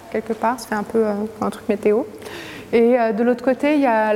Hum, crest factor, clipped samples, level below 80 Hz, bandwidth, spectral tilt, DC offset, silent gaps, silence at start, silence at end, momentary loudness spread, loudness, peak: none; 16 dB; under 0.1%; -56 dBFS; 16 kHz; -6 dB/octave; under 0.1%; none; 0 s; 0 s; 11 LU; -19 LUFS; -4 dBFS